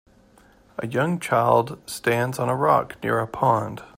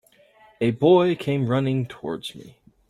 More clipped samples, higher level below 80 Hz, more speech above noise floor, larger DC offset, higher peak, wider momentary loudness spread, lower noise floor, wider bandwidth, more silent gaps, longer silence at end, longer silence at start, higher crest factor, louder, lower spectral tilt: neither; about the same, -58 dBFS vs -60 dBFS; about the same, 32 dB vs 33 dB; neither; about the same, -4 dBFS vs -6 dBFS; second, 9 LU vs 14 LU; about the same, -54 dBFS vs -55 dBFS; first, 16 kHz vs 12 kHz; neither; second, 0.1 s vs 0.4 s; first, 0.8 s vs 0.6 s; about the same, 18 dB vs 18 dB; about the same, -22 LUFS vs -22 LUFS; second, -6 dB/octave vs -8 dB/octave